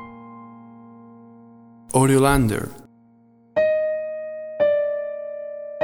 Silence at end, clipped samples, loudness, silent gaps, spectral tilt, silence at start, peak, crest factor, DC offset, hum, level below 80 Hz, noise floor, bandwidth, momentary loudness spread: 0 s; under 0.1%; -22 LUFS; none; -6 dB/octave; 0 s; -4 dBFS; 20 dB; under 0.1%; none; -42 dBFS; -54 dBFS; 18 kHz; 24 LU